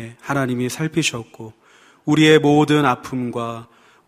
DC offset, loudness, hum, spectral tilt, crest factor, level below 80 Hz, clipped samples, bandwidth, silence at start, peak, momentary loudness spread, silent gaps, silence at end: under 0.1%; -18 LUFS; none; -5 dB/octave; 18 dB; -58 dBFS; under 0.1%; 15.5 kHz; 0 s; 0 dBFS; 19 LU; none; 0.45 s